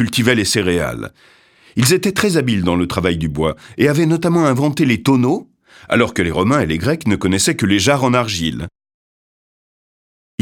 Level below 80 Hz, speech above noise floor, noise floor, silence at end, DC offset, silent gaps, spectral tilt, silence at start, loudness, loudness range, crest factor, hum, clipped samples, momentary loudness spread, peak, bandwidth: -42 dBFS; over 74 dB; under -90 dBFS; 1.75 s; under 0.1%; none; -5 dB/octave; 0 s; -16 LUFS; 2 LU; 16 dB; none; under 0.1%; 8 LU; 0 dBFS; 18.5 kHz